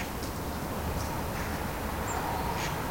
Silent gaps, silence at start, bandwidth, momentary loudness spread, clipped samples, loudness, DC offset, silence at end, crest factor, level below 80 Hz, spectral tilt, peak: none; 0 s; 16.5 kHz; 3 LU; under 0.1%; -33 LUFS; under 0.1%; 0 s; 14 dB; -42 dBFS; -4.5 dB/octave; -20 dBFS